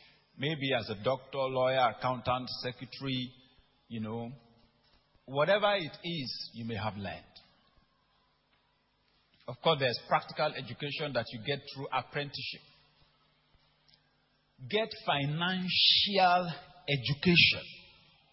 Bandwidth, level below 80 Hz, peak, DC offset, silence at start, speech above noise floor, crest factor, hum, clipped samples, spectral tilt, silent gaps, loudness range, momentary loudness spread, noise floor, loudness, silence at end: 5.8 kHz; -64 dBFS; -10 dBFS; under 0.1%; 0.35 s; 41 dB; 24 dB; none; under 0.1%; -8 dB/octave; none; 13 LU; 17 LU; -73 dBFS; -31 LUFS; 0.5 s